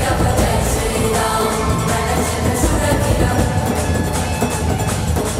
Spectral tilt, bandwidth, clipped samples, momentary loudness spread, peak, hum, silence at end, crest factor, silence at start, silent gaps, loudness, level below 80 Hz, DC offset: -5 dB/octave; 16 kHz; under 0.1%; 3 LU; -2 dBFS; none; 0 s; 14 dB; 0 s; none; -17 LUFS; -24 dBFS; under 0.1%